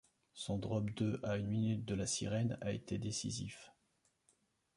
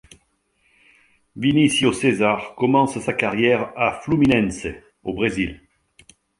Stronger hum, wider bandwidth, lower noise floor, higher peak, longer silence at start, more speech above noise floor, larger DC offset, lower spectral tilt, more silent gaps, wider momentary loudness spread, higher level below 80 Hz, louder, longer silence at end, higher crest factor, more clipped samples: neither; about the same, 11.5 kHz vs 11.5 kHz; first, -79 dBFS vs -66 dBFS; second, -24 dBFS vs -2 dBFS; second, 0.35 s vs 1.35 s; second, 40 dB vs 46 dB; neither; about the same, -5 dB/octave vs -5 dB/octave; neither; about the same, 9 LU vs 11 LU; second, -62 dBFS vs -48 dBFS; second, -39 LUFS vs -20 LUFS; first, 1.05 s vs 0.85 s; about the same, 16 dB vs 18 dB; neither